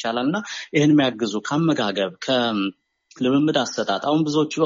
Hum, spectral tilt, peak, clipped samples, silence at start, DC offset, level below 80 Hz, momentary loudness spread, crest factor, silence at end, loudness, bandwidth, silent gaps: none; -4.5 dB/octave; -6 dBFS; under 0.1%; 0 s; under 0.1%; -66 dBFS; 8 LU; 16 dB; 0 s; -21 LUFS; 7.4 kHz; none